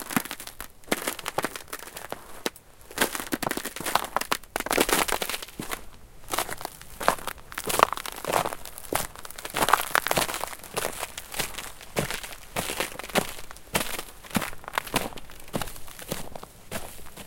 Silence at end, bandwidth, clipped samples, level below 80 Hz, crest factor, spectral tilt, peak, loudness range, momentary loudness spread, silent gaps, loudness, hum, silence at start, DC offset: 0 s; 17 kHz; under 0.1%; -48 dBFS; 30 dB; -2.5 dB/octave; 0 dBFS; 5 LU; 15 LU; none; -29 LUFS; none; 0 s; under 0.1%